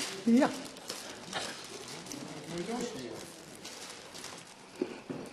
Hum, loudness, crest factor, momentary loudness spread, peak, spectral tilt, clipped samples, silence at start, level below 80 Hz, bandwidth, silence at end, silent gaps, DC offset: none; -36 LUFS; 22 dB; 17 LU; -14 dBFS; -3.5 dB/octave; under 0.1%; 0 s; -72 dBFS; 13.5 kHz; 0 s; none; under 0.1%